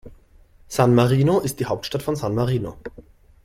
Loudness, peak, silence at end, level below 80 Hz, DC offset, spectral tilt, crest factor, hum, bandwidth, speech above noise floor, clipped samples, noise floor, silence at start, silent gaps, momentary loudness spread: -21 LUFS; -4 dBFS; 0.45 s; -46 dBFS; under 0.1%; -6.5 dB/octave; 18 dB; none; 15.5 kHz; 31 dB; under 0.1%; -51 dBFS; 0.05 s; none; 15 LU